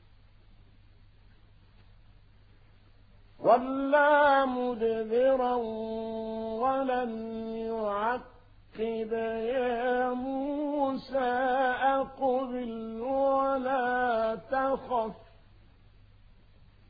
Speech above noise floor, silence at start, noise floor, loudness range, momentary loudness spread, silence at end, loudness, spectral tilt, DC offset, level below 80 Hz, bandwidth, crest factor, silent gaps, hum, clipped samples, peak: 29 dB; 3.4 s; -57 dBFS; 6 LU; 10 LU; 1.65 s; -29 LUFS; -8 dB/octave; under 0.1%; -58 dBFS; 5 kHz; 20 dB; none; none; under 0.1%; -10 dBFS